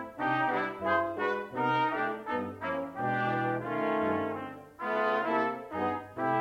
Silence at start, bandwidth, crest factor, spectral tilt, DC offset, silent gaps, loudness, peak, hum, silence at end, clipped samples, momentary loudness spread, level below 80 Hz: 0 s; 16 kHz; 16 dB; -7 dB/octave; under 0.1%; none; -31 LUFS; -16 dBFS; none; 0 s; under 0.1%; 6 LU; -70 dBFS